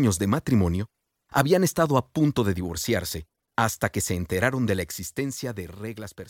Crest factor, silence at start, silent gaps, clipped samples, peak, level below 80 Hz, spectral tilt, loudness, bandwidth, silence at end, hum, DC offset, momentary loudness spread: 18 dB; 0 s; none; under 0.1%; -6 dBFS; -48 dBFS; -5.5 dB/octave; -25 LUFS; 17 kHz; 0 s; none; under 0.1%; 13 LU